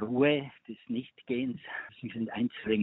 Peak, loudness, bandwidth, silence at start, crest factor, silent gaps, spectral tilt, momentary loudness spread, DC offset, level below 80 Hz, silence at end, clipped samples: -12 dBFS; -33 LUFS; 4.1 kHz; 0 s; 20 dB; none; -4.5 dB/octave; 14 LU; under 0.1%; -68 dBFS; 0 s; under 0.1%